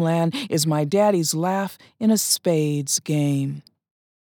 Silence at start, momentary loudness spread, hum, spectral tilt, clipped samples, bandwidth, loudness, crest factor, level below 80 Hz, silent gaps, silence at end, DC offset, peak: 0 s; 7 LU; none; -4.5 dB/octave; under 0.1%; 20 kHz; -21 LUFS; 16 dB; -80 dBFS; none; 0.75 s; under 0.1%; -6 dBFS